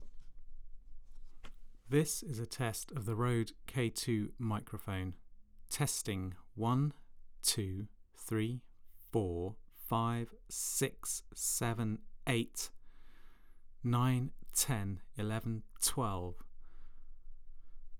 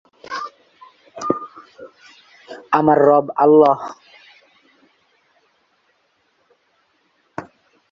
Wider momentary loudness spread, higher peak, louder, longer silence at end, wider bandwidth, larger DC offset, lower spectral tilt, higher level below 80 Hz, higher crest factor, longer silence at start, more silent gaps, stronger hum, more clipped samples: second, 10 LU vs 26 LU; second, -18 dBFS vs 0 dBFS; second, -37 LUFS vs -16 LUFS; second, 0 s vs 0.5 s; first, over 20 kHz vs 7.4 kHz; neither; second, -4.5 dB/octave vs -7 dB/octave; first, -54 dBFS vs -62 dBFS; about the same, 20 dB vs 20 dB; second, 0 s vs 0.3 s; neither; neither; neither